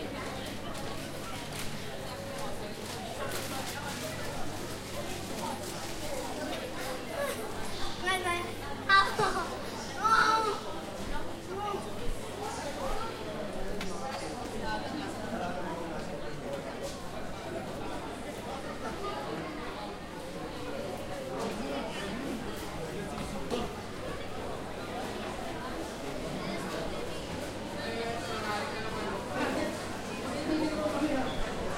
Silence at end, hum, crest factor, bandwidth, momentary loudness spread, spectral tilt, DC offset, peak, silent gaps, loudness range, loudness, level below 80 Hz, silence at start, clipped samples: 0 s; none; 24 dB; 16 kHz; 8 LU; -4 dB/octave; under 0.1%; -10 dBFS; none; 9 LU; -35 LUFS; -48 dBFS; 0 s; under 0.1%